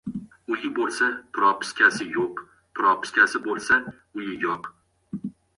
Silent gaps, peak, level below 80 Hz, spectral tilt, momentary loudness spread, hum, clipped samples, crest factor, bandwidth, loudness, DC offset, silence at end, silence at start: none; -4 dBFS; -64 dBFS; -3.5 dB/octave; 17 LU; none; under 0.1%; 20 dB; 11 kHz; -23 LUFS; under 0.1%; 0.25 s; 0.05 s